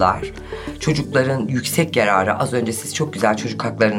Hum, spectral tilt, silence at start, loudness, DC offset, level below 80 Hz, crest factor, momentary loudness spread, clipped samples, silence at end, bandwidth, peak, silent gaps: none; -5 dB/octave; 0 s; -19 LUFS; under 0.1%; -44 dBFS; 18 dB; 9 LU; under 0.1%; 0 s; 16.5 kHz; -2 dBFS; none